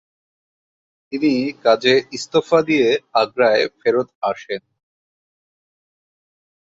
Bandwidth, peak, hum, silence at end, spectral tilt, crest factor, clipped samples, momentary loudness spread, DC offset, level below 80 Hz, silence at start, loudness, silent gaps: 7.8 kHz; -2 dBFS; none; 2.05 s; -4.5 dB/octave; 18 dB; under 0.1%; 10 LU; under 0.1%; -64 dBFS; 1.1 s; -18 LUFS; 4.15-4.21 s